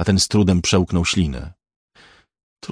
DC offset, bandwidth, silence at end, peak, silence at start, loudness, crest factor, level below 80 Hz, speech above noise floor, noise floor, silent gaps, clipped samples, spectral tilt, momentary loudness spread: under 0.1%; 10.5 kHz; 0.05 s; -4 dBFS; 0 s; -18 LUFS; 16 dB; -36 dBFS; 34 dB; -52 dBFS; 1.76-1.88 s, 2.43-2.56 s; under 0.1%; -4.5 dB/octave; 19 LU